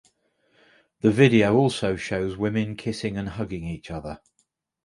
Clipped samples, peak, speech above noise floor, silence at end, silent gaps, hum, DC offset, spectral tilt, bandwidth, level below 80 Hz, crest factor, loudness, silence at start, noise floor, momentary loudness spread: under 0.1%; -4 dBFS; 49 dB; 0.7 s; none; none; under 0.1%; -6.5 dB/octave; 11.5 kHz; -50 dBFS; 22 dB; -23 LUFS; 1.05 s; -72 dBFS; 17 LU